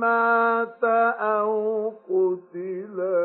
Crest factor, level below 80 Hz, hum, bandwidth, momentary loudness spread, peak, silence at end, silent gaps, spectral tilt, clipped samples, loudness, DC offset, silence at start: 14 dB; under -90 dBFS; none; 4.4 kHz; 12 LU; -10 dBFS; 0 s; none; -10.5 dB/octave; under 0.1%; -23 LUFS; under 0.1%; 0 s